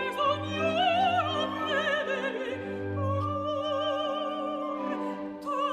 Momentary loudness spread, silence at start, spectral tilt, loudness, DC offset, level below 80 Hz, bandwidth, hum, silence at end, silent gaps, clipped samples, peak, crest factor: 9 LU; 0 s; -5.5 dB/octave; -29 LUFS; under 0.1%; -68 dBFS; 13.5 kHz; none; 0 s; none; under 0.1%; -14 dBFS; 14 dB